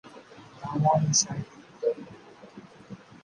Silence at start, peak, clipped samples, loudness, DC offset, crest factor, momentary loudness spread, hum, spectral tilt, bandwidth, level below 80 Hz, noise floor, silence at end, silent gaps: 0.05 s; -10 dBFS; under 0.1%; -26 LUFS; under 0.1%; 20 dB; 26 LU; none; -4 dB/octave; 10.5 kHz; -64 dBFS; -49 dBFS; 0.25 s; none